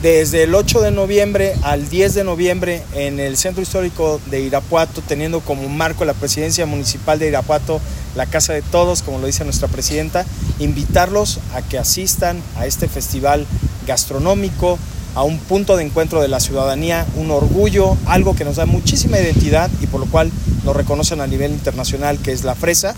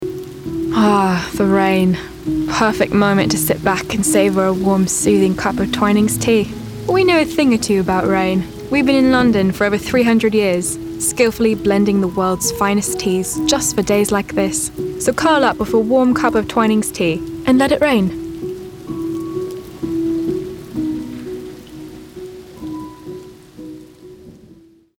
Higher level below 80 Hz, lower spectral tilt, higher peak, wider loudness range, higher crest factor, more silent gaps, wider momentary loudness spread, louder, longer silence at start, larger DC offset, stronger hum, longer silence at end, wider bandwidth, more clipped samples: first, -26 dBFS vs -42 dBFS; about the same, -4.5 dB/octave vs -4.5 dB/octave; about the same, 0 dBFS vs -2 dBFS; second, 3 LU vs 10 LU; about the same, 16 dB vs 14 dB; neither; second, 7 LU vs 16 LU; about the same, -16 LUFS vs -16 LUFS; about the same, 0 s vs 0 s; neither; neither; second, 0 s vs 0.65 s; about the same, 17 kHz vs 17.5 kHz; neither